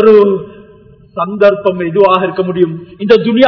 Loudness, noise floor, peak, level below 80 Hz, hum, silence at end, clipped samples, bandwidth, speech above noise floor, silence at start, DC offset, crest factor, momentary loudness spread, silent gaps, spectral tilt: -11 LUFS; -40 dBFS; 0 dBFS; -50 dBFS; none; 0 s; 2%; 5.4 kHz; 31 dB; 0 s; under 0.1%; 10 dB; 12 LU; none; -8.5 dB/octave